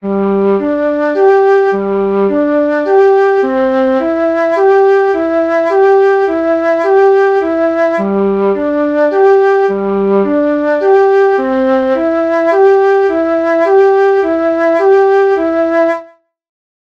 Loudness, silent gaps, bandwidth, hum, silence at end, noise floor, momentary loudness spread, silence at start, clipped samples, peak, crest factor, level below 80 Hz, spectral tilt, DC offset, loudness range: -10 LUFS; none; 6.4 kHz; none; 0.85 s; -37 dBFS; 5 LU; 0.05 s; under 0.1%; 0 dBFS; 10 dB; -48 dBFS; -7.5 dB/octave; under 0.1%; 1 LU